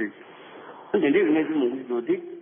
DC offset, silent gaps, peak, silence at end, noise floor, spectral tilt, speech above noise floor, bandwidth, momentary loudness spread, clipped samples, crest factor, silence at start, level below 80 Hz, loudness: under 0.1%; none; -10 dBFS; 0 s; -45 dBFS; -10.5 dB/octave; 22 dB; 3.6 kHz; 23 LU; under 0.1%; 14 dB; 0 s; -72 dBFS; -24 LUFS